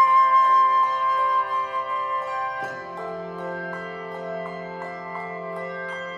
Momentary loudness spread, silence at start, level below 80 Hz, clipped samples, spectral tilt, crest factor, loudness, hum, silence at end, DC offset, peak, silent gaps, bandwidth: 17 LU; 0 s; -68 dBFS; under 0.1%; -5 dB/octave; 14 dB; -24 LUFS; none; 0 s; under 0.1%; -8 dBFS; none; 7.8 kHz